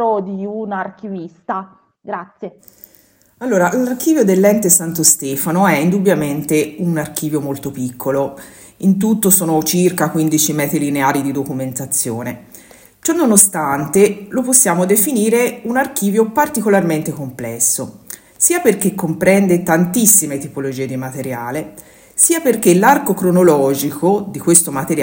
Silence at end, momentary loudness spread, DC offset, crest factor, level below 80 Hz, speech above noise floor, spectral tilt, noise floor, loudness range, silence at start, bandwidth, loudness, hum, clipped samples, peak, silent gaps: 0 s; 14 LU; under 0.1%; 16 dB; -56 dBFS; 31 dB; -4.5 dB/octave; -46 dBFS; 5 LU; 0 s; 18 kHz; -14 LUFS; none; under 0.1%; 0 dBFS; none